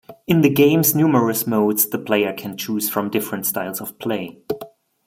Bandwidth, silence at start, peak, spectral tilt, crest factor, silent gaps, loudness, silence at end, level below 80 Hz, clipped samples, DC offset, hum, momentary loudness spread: 16.5 kHz; 0.1 s; -2 dBFS; -5 dB/octave; 16 dB; none; -19 LUFS; 0.4 s; -60 dBFS; under 0.1%; under 0.1%; none; 13 LU